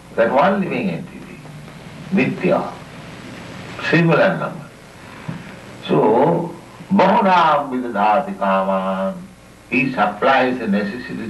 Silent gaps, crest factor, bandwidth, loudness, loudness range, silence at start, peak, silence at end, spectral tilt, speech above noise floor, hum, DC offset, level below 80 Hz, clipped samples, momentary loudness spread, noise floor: none; 16 dB; 12 kHz; -17 LUFS; 5 LU; 0.05 s; -2 dBFS; 0 s; -7 dB/octave; 22 dB; none; under 0.1%; -54 dBFS; under 0.1%; 21 LU; -39 dBFS